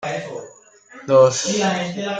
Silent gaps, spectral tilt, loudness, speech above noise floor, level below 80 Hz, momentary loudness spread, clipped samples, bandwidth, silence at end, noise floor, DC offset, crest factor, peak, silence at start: none; -4 dB/octave; -18 LUFS; 29 dB; -62 dBFS; 20 LU; under 0.1%; 9.4 kHz; 0 s; -46 dBFS; under 0.1%; 18 dB; -2 dBFS; 0 s